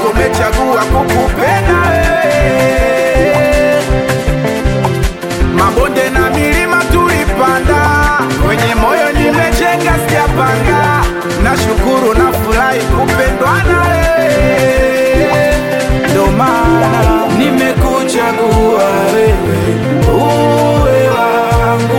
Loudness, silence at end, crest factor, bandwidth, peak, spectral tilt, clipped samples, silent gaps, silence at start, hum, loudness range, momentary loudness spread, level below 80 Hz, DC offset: -10 LUFS; 0 s; 10 dB; 17 kHz; 0 dBFS; -5.5 dB/octave; under 0.1%; none; 0 s; none; 1 LU; 3 LU; -20 dBFS; 0.4%